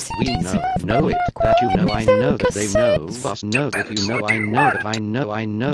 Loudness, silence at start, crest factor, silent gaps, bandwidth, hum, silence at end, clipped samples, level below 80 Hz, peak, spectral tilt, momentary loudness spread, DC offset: -19 LUFS; 0 s; 16 dB; none; 13 kHz; none; 0 s; under 0.1%; -38 dBFS; -4 dBFS; -5 dB/octave; 6 LU; under 0.1%